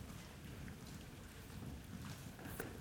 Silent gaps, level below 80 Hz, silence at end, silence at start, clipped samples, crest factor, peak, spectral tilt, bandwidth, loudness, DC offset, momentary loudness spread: none; -60 dBFS; 0 s; 0 s; under 0.1%; 22 dB; -28 dBFS; -5 dB/octave; over 20 kHz; -52 LUFS; under 0.1%; 5 LU